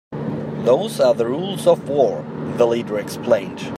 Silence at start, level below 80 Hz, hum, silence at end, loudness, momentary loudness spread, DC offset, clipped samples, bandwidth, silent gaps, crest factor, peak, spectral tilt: 0.1 s; -60 dBFS; none; 0 s; -19 LUFS; 9 LU; under 0.1%; under 0.1%; 15 kHz; none; 16 dB; -4 dBFS; -6 dB/octave